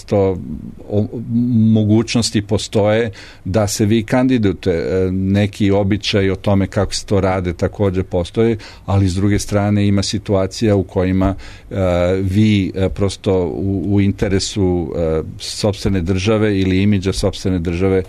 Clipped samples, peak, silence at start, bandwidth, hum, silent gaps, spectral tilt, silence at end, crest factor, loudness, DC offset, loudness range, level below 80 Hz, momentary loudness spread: under 0.1%; -4 dBFS; 0.05 s; 13.5 kHz; none; none; -6 dB/octave; 0 s; 12 dB; -17 LUFS; under 0.1%; 2 LU; -34 dBFS; 6 LU